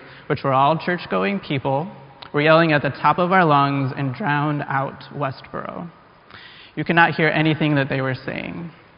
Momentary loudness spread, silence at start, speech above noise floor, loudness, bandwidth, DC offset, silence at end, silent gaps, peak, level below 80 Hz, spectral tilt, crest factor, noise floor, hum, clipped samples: 16 LU; 0 s; 25 dB; -20 LUFS; 5.4 kHz; under 0.1%; 0.25 s; none; 0 dBFS; -58 dBFS; -4.5 dB/octave; 20 dB; -44 dBFS; none; under 0.1%